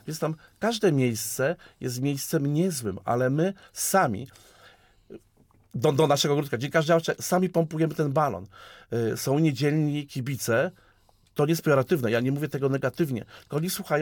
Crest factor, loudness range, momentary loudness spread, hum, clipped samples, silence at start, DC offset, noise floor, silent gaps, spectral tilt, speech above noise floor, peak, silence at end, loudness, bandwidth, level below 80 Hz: 16 dB; 3 LU; 9 LU; none; under 0.1%; 0.05 s; under 0.1%; -61 dBFS; none; -5.5 dB/octave; 36 dB; -10 dBFS; 0 s; -26 LUFS; 19.5 kHz; -64 dBFS